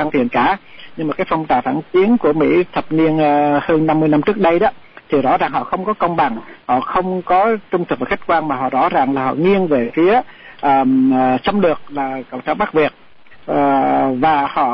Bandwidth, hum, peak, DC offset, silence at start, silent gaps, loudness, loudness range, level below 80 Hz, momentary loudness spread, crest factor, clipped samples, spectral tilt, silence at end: 5.8 kHz; none; -6 dBFS; under 0.1%; 0 s; none; -16 LUFS; 3 LU; -48 dBFS; 7 LU; 10 dB; under 0.1%; -9.5 dB/octave; 0 s